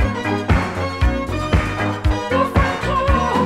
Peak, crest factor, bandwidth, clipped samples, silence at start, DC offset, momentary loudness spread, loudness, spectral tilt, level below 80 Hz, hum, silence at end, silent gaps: -2 dBFS; 16 dB; 13 kHz; under 0.1%; 0 s; under 0.1%; 4 LU; -19 LUFS; -6.5 dB/octave; -24 dBFS; none; 0 s; none